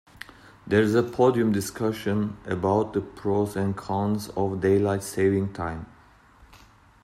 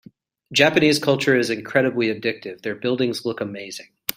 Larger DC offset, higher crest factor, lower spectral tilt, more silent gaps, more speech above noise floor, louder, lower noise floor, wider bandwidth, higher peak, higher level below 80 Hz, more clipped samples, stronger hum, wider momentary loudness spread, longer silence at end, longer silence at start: neither; about the same, 18 dB vs 20 dB; first, -6.5 dB/octave vs -4.5 dB/octave; neither; first, 30 dB vs 26 dB; second, -25 LUFS vs -21 LUFS; first, -54 dBFS vs -46 dBFS; about the same, 15 kHz vs 16 kHz; second, -8 dBFS vs -2 dBFS; first, -56 dBFS vs -62 dBFS; neither; neither; second, 10 LU vs 13 LU; first, 0.5 s vs 0.05 s; first, 0.65 s vs 0.5 s